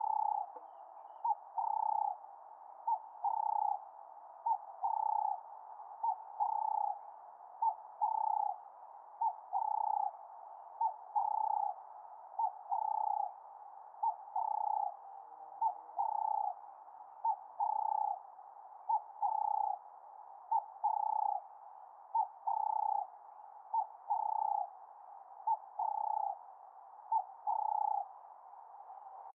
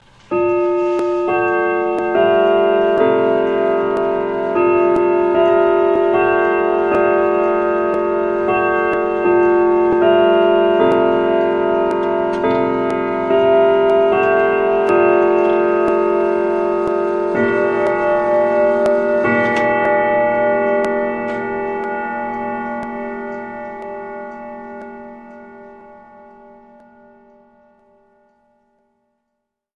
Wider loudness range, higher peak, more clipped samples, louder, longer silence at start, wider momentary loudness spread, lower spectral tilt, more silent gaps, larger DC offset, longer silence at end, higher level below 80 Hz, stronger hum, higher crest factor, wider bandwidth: second, 1 LU vs 11 LU; second, -24 dBFS vs -2 dBFS; neither; second, -37 LUFS vs -15 LUFS; second, 0 s vs 0.3 s; first, 19 LU vs 11 LU; second, 7 dB/octave vs -7 dB/octave; neither; neither; second, 0.05 s vs 3.85 s; second, under -90 dBFS vs -50 dBFS; neither; about the same, 14 dB vs 14 dB; second, 1.9 kHz vs 7 kHz